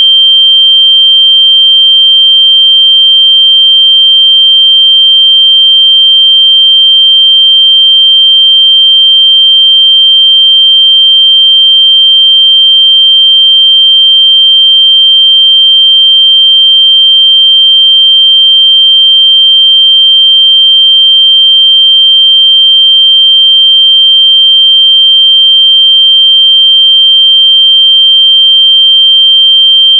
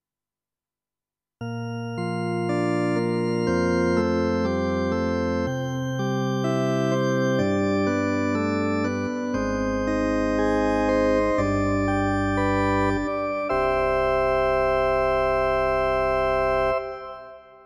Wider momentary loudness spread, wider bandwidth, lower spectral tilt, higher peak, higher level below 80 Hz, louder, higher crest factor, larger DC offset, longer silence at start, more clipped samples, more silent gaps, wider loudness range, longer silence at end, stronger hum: second, 0 LU vs 6 LU; second, 3.4 kHz vs 13.5 kHz; second, 17.5 dB/octave vs -7 dB/octave; first, 0 dBFS vs -10 dBFS; second, under -90 dBFS vs -42 dBFS; first, 0 LUFS vs -23 LUFS; second, 4 dB vs 14 dB; neither; second, 0 s vs 1.4 s; first, 0.6% vs under 0.1%; neither; about the same, 0 LU vs 2 LU; second, 0 s vs 0.25 s; neither